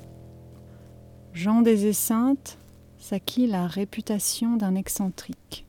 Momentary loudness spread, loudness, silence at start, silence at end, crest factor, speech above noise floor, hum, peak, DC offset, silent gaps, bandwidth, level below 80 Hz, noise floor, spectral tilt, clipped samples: 18 LU; -25 LUFS; 0 s; 0.05 s; 20 dB; 23 dB; none; -6 dBFS; under 0.1%; none; 18.5 kHz; -56 dBFS; -47 dBFS; -5 dB/octave; under 0.1%